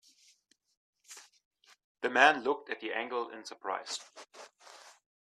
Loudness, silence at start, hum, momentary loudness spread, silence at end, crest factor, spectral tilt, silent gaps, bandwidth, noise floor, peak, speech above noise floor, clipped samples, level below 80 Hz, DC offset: -31 LUFS; 1.1 s; none; 28 LU; 0.45 s; 26 dB; -1.5 dB/octave; 1.45-1.51 s, 1.84-1.95 s; 13.5 kHz; -69 dBFS; -8 dBFS; 38 dB; under 0.1%; -82 dBFS; under 0.1%